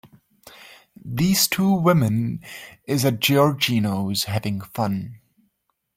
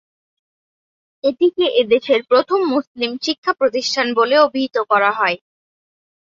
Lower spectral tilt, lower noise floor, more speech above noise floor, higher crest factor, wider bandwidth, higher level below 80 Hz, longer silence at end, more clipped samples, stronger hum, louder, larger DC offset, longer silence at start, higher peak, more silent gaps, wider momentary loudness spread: first, -5 dB/octave vs -3 dB/octave; second, -72 dBFS vs under -90 dBFS; second, 52 dB vs over 73 dB; about the same, 18 dB vs 16 dB; first, 16.5 kHz vs 7.6 kHz; first, -56 dBFS vs -68 dBFS; second, 0.8 s vs 0.95 s; neither; neither; second, -21 LUFS vs -17 LUFS; neither; second, 0.05 s vs 1.25 s; about the same, -4 dBFS vs -2 dBFS; second, none vs 2.87-2.95 s, 3.38-3.43 s; first, 15 LU vs 7 LU